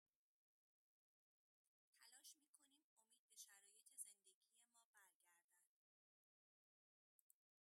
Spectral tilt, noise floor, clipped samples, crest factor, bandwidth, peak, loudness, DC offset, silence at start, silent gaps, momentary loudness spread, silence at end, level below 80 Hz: 3 dB/octave; under -90 dBFS; under 0.1%; 34 dB; 15.5 kHz; -40 dBFS; -63 LUFS; under 0.1%; 1.9 s; 2.48-2.54 s, 2.84-2.97 s, 3.19-3.28 s, 4.34-4.41 s, 4.85-4.93 s, 5.15-5.20 s, 5.44-5.49 s; 10 LU; 2.1 s; under -90 dBFS